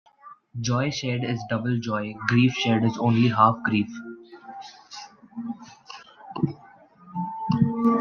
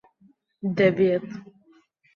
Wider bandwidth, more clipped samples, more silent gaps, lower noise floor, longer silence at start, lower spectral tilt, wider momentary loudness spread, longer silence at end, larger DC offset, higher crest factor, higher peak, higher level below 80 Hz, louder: about the same, 7 kHz vs 6.8 kHz; neither; neither; second, -50 dBFS vs -61 dBFS; second, 0.25 s vs 0.65 s; second, -6 dB/octave vs -8.5 dB/octave; about the same, 22 LU vs 20 LU; second, 0 s vs 0.75 s; neither; about the same, 22 dB vs 20 dB; about the same, -4 dBFS vs -6 dBFS; about the same, -62 dBFS vs -66 dBFS; about the same, -24 LUFS vs -23 LUFS